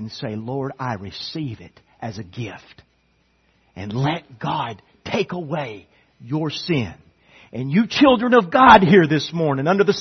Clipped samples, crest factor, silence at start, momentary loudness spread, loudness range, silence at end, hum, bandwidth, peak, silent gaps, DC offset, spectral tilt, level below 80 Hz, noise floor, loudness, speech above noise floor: under 0.1%; 20 dB; 0 s; 20 LU; 15 LU; 0 s; none; 6.4 kHz; 0 dBFS; none; under 0.1%; -6.5 dB/octave; -52 dBFS; -63 dBFS; -18 LUFS; 44 dB